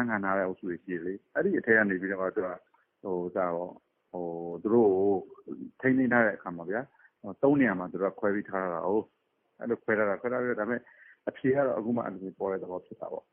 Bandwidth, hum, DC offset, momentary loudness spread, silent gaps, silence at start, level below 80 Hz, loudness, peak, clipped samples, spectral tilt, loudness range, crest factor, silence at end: 3.5 kHz; none; under 0.1%; 16 LU; none; 0 s; -72 dBFS; -29 LUFS; -10 dBFS; under 0.1%; -2 dB/octave; 3 LU; 20 dB; 0.1 s